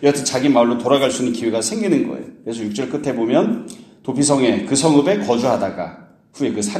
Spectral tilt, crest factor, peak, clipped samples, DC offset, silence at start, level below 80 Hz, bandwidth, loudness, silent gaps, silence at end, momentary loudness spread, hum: -4.5 dB/octave; 18 dB; 0 dBFS; under 0.1%; under 0.1%; 0 s; -58 dBFS; 13.5 kHz; -18 LUFS; none; 0 s; 12 LU; none